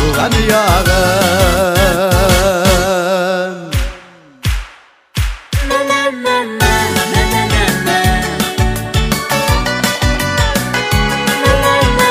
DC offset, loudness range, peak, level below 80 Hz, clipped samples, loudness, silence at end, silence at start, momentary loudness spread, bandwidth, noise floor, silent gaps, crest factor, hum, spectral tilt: under 0.1%; 6 LU; 0 dBFS; -20 dBFS; under 0.1%; -13 LUFS; 0 s; 0 s; 9 LU; 16.5 kHz; -41 dBFS; none; 12 dB; none; -4 dB/octave